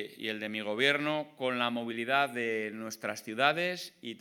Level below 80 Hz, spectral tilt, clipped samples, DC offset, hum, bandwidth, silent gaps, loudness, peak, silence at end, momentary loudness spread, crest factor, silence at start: under -90 dBFS; -3.5 dB/octave; under 0.1%; under 0.1%; none; 19 kHz; none; -31 LUFS; -10 dBFS; 0 s; 10 LU; 22 dB; 0 s